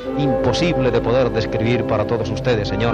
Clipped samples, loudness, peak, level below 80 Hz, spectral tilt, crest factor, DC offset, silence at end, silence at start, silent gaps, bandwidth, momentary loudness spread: under 0.1%; -19 LUFS; -4 dBFS; -34 dBFS; -6.5 dB/octave; 14 dB; under 0.1%; 0 s; 0 s; none; 9.4 kHz; 3 LU